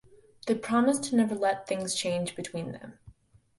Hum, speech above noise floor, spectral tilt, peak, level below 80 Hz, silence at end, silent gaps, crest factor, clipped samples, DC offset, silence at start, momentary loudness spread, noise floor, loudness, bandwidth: none; 28 dB; -4.5 dB/octave; -12 dBFS; -66 dBFS; 0.45 s; none; 18 dB; under 0.1%; under 0.1%; 0.45 s; 15 LU; -57 dBFS; -29 LUFS; 11.5 kHz